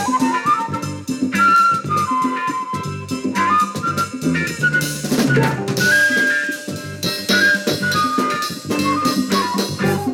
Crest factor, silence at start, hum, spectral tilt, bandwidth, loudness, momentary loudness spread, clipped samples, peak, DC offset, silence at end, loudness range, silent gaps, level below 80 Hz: 14 dB; 0 s; none; -4 dB/octave; 18 kHz; -17 LUFS; 10 LU; under 0.1%; -6 dBFS; under 0.1%; 0 s; 2 LU; none; -54 dBFS